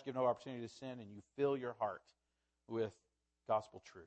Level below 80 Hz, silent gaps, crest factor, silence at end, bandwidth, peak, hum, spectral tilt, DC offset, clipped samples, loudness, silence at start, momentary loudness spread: -82 dBFS; none; 20 dB; 0 s; 8.4 kHz; -24 dBFS; none; -6.5 dB/octave; under 0.1%; under 0.1%; -42 LUFS; 0 s; 16 LU